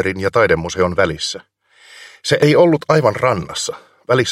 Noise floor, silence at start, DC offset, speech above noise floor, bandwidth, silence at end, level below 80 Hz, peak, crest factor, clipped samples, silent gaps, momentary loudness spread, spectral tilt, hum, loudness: -45 dBFS; 0 s; under 0.1%; 29 dB; 15 kHz; 0 s; -46 dBFS; 0 dBFS; 16 dB; under 0.1%; none; 12 LU; -5 dB/octave; none; -16 LUFS